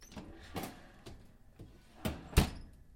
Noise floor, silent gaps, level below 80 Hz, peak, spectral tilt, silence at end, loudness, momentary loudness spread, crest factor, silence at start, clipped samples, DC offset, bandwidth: -56 dBFS; none; -44 dBFS; -12 dBFS; -5 dB/octave; 0 s; -38 LUFS; 24 LU; 28 dB; 0 s; under 0.1%; under 0.1%; 16.5 kHz